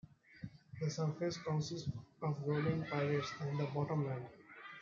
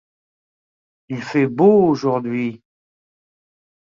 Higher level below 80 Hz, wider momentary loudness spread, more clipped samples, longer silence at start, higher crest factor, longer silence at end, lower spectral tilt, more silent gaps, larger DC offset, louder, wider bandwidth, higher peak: second, -72 dBFS vs -62 dBFS; about the same, 16 LU vs 15 LU; neither; second, 0.3 s vs 1.1 s; about the same, 16 dB vs 18 dB; second, 0 s vs 1.4 s; second, -6.5 dB/octave vs -8 dB/octave; neither; neither; second, -39 LUFS vs -17 LUFS; about the same, 7.6 kHz vs 7.4 kHz; second, -24 dBFS vs -2 dBFS